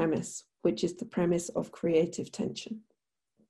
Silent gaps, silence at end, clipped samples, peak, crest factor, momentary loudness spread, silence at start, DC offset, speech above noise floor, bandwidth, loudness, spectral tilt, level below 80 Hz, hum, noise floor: none; 0.7 s; under 0.1%; -14 dBFS; 18 dB; 12 LU; 0 s; under 0.1%; 48 dB; 12.5 kHz; -32 LUFS; -5.5 dB/octave; -66 dBFS; none; -80 dBFS